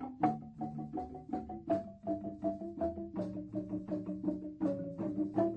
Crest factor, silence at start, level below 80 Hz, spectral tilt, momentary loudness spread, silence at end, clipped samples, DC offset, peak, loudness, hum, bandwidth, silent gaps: 20 dB; 0 s; -62 dBFS; -10 dB/octave; 7 LU; 0 s; under 0.1%; under 0.1%; -18 dBFS; -39 LUFS; none; 5.6 kHz; none